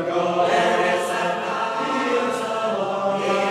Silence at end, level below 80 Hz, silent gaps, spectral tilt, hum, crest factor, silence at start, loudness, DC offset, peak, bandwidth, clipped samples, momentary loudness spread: 0 s; -78 dBFS; none; -4 dB/octave; none; 14 dB; 0 s; -22 LUFS; under 0.1%; -8 dBFS; 14.5 kHz; under 0.1%; 5 LU